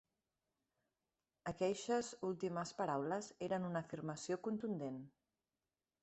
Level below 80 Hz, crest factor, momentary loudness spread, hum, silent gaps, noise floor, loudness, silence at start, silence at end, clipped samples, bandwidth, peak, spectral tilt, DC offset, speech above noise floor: -78 dBFS; 18 dB; 8 LU; none; none; under -90 dBFS; -43 LUFS; 1.45 s; 0.95 s; under 0.1%; 8.2 kHz; -26 dBFS; -5.5 dB/octave; under 0.1%; over 48 dB